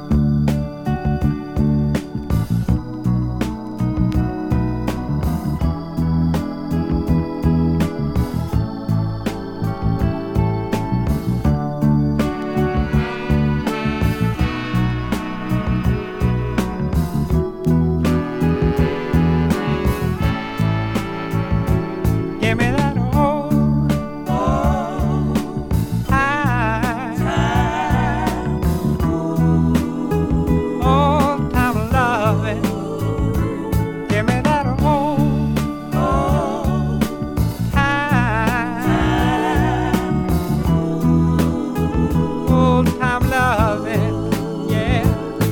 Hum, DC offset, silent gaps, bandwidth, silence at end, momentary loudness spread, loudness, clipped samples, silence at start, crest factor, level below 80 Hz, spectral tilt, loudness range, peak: none; under 0.1%; none; 18 kHz; 0 s; 5 LU; -19 LUFS; under 0.1%; 0 s; 18 dB; -28 dBFS; -7.5 dB/octave; 3 LU; 0 dBFS